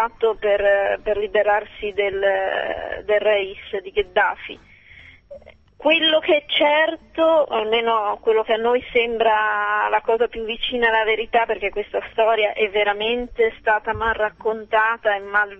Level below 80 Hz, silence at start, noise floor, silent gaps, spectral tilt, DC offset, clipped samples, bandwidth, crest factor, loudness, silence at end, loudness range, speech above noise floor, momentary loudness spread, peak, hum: -48 dBFS; 0 s; -46 dBFS; none; -5.5 dB/octave; under 0.1%; under 0.1%; 5.8 kHz; 16 dB; -20 LUFS; 0.05 s; 4 LU; 26 dB; 7 LU; -4 dBFS; none